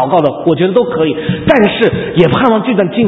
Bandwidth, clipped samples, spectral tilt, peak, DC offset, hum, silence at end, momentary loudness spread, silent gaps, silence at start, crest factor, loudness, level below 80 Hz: 6 kHz; 0.3%; -9 dB/octave; 0 dBFS; under 0.1%; none; 0 s; 5 LU; none; 0 s; 10 dB; -11 LUFS; -40 dBFS